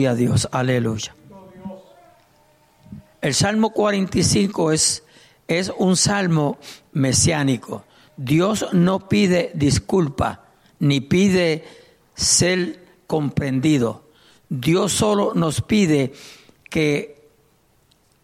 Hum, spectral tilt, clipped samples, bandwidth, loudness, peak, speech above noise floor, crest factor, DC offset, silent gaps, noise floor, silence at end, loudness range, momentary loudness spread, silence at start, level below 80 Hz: none; -4.5 dB/octave; under 0.1%; 15.5 kHz; -19 LUFS; -4 dBFS; 41 dB; 16 dB; under 0.1%; none; -59 dBFS; 1.1 s; 3 LU; 12 LU; 0 s; -46 dBFS